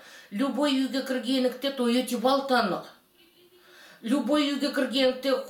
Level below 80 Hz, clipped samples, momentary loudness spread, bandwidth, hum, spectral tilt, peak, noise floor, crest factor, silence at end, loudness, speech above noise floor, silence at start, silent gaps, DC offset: -72 dBFS; under 0.1%; 6 LU; 17 kHz; none; -4 dB/octave; -10 dBFS; -59 dBFS; 16 dB; 0 s; -26 LUFS; 34 dB; 0.05 s; none; under 0.1%